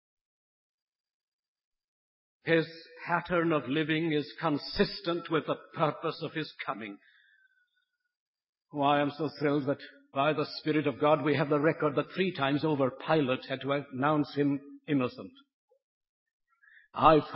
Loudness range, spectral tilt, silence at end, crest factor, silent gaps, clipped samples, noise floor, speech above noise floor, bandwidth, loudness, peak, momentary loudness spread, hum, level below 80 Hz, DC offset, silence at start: 6 LU; -10 dB/octave; 0 s; 24 dB; 8.20-8.34 s, 8.49-8.53 s, 15.54-15.68 s, 15.82-16.01 s, 16.09-16.26 s, 16.33-16.40 s; under 0.1%; -80 dBFS; 50 dB; 5.8 kHz; -30 LUFS; -8 dBFS; 10 LU; none; -62 dBFS; under 0.1%; 2.45 s